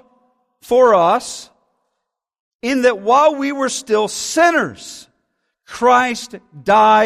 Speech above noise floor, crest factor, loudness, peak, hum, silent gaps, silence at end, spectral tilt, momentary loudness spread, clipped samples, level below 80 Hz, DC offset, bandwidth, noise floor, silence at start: 62 dB; 16 dB; -15 LUFS; -2 dBFS; none; 2.40-2.59 s; 0 s; -3 dB/octave; 18 LU; under 0.1%; -58 dBFS; under 0.1%; 14.5 kHz; -77 dBFS; 0.7 s